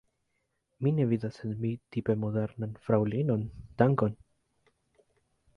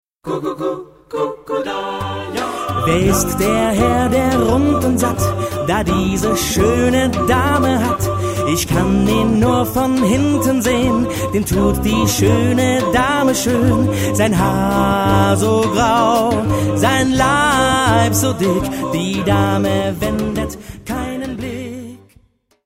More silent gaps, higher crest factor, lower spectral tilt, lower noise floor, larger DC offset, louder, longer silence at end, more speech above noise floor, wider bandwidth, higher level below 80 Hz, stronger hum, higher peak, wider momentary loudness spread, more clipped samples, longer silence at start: neither; first, 22 dB vs 14 dB; first, -10 dB/octave vs -5 dB/octave; first, -79 dBFS vs -53 dBFS; neither; second, -30 LUFS vs -16 LUFS; first, 1.45 s vs 0.7 s; first, 50 dB vs 38 dB; second, 6.4 kHz vs 16.5 kHz; second, -60 dBFS vs -32 dBFS; neither; second, -10 dBFS vs -2 dBFS; about the same, 9 LU vs 9 LU; neither; first, 0.8 s vs 0.25 s